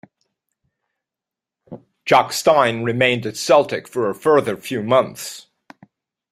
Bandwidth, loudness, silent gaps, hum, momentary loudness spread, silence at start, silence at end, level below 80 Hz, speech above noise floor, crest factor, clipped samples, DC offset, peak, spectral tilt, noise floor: 15.5 kHz; -18 LUFS; none; none; 13 LU; 1.7 s; 0.9 s; -62 dBFS; 69 dB; 20 dB; under 0.1%; under 0.1%; -2 dBFS; -4 dB/octave; -87 dBFS